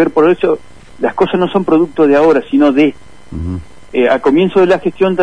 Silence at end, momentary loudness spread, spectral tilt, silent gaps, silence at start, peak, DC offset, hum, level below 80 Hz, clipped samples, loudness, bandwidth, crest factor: 0 s; 13 LU; -7.5 dB/octave; none; 0 s; 0 dBFS; 2%; none; -40 dBFS; under 0.1%; -12 LUFS; 10 kHz; 12 dB